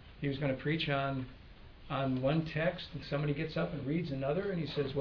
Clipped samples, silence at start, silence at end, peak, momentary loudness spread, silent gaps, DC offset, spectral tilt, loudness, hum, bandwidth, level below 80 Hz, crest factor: under 0.1%; 0 s; 0 s; -18 dBFS; 7 LU; none; under 0.1%; -5.5 dB/octave; -35 LUFS; none; 5.4 kHz; -56 dBFS; 16 dB